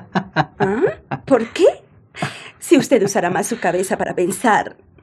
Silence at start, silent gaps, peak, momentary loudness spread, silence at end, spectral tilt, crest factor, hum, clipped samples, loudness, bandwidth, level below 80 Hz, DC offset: 0 s; none; 0 dBFS; 13 LU; 0.3 s; -5 dB/octave; 18 dB; none; under 0.1%; -18 LUFS; 15 kHz; -56 dBFS; under 0.1%